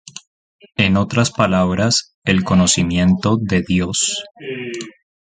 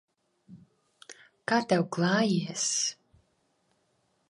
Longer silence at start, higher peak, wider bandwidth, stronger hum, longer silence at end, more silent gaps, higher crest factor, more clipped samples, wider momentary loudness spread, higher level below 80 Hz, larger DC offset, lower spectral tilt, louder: second, 0.15 s vs 0.5 s; first, 0 dBFS vs -12 dBFS; second, 9.6 kHz vs 11.5 kHz; neither; second, 0.3 s vs 1.4 s; first, 0.27-0.59 s, 2.14-2.22 s vs none; about the same, 18 dB vs 20 dB; neither; about the same, 14 LU vs 15 LU; first, -38 dBFS vs -76 dBFS; neither; about the same, -4.5 dB/octave vs -4 dB/octave; first, -16 LUFS vs -27 LUFS